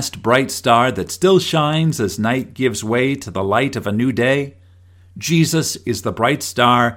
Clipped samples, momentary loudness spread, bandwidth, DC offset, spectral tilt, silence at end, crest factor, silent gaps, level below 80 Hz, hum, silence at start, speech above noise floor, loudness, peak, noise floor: under 0.1%; 6 LU; 17 kHz; under 0.1%; -5 dB/octave; 0 s; 18 dB; none; -52 dBFS; none; 0 s; 30 dB; -17 LUFS; 0 dBFS; -47 dBFS